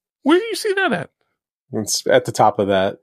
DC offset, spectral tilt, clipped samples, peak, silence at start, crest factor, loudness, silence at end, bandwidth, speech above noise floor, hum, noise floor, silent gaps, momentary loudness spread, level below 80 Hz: under 0.1%; -4 dB/octave; under 0.1%; -2 dBFS; 0.25 s; 18 dB; -18 LUFS; 0.05 s; 15.5 kHz; 56 dB; none; -73 dBFS; 1.52-1.66 s; 11 LU; -66 dBFS